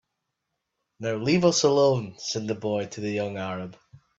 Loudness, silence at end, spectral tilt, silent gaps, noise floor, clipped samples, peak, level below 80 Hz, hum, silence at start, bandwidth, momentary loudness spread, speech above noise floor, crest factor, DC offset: -25 LUFS; 0.2 s; -4.5 dB/octave; none; -81 dBFS; under 0.1%; -6 dBFS; -66 dBFS; none; 1 s; 8 kHz; 13 LU; 56 dB; 20 dB; under 0.1%